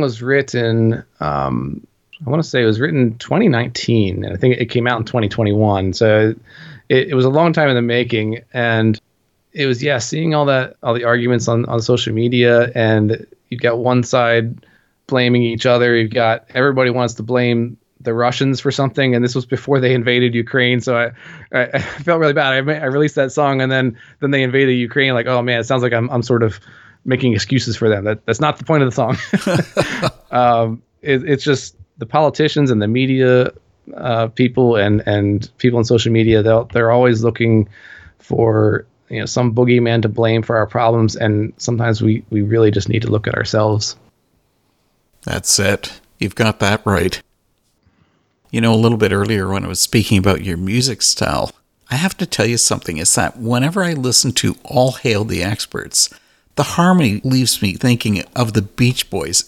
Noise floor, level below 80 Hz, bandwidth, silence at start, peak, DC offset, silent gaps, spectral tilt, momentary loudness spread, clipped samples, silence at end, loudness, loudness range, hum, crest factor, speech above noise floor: -63 dBFS; -46 dBFS; 15.5 kHz; 0 s; 0 dBFS; under 0.1%; none; -5 dB/octave; 7 LU; under 0.1%; 0.05 s; -16 LUFS; 3 LU; none; 16 dB; 48 dB